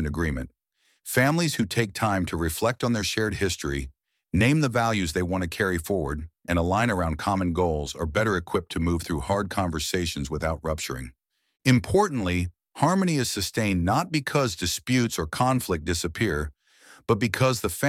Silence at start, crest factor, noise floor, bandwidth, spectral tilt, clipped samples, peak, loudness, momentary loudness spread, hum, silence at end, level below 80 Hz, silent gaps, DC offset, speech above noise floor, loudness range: 0 s; 20 dB; -54 dBFS; 16.5 kHz; -5 dB/octave; under 0.1%; -6 dBFS; -25 LUFS; 7 LU; none; 0 s; -42 dBFS; none; under 0.1%; 30 dB; 2 LU